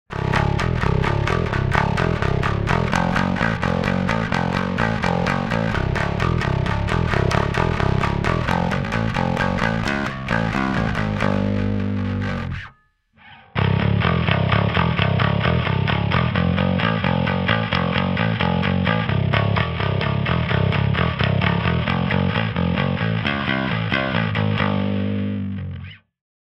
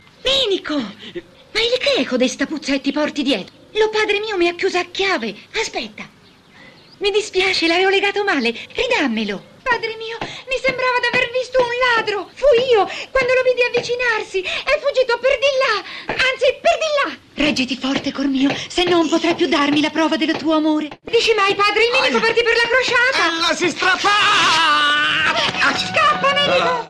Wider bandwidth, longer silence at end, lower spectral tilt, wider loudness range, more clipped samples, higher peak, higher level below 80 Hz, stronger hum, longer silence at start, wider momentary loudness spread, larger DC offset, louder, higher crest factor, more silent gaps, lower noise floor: second, 10 kHz vs 12.5 kHz; first, 0.5 s vs 0 s; first, -7 dB/octave vs -3 dB/octave; about the same, 3 LU vs 5 LU; neither; first, 0 dBFS vs -4 dBFS; first, -34 dBFS vs -48 dBFS; neither; second, 0.1 s vs 0.25 s; second, 4 LU vs 9 LU; neither; second, -21 LUFS vs -17 LUFS; first, 20 dB vs 12 dB; neither; first, -57 dBFS vs -46 dBFS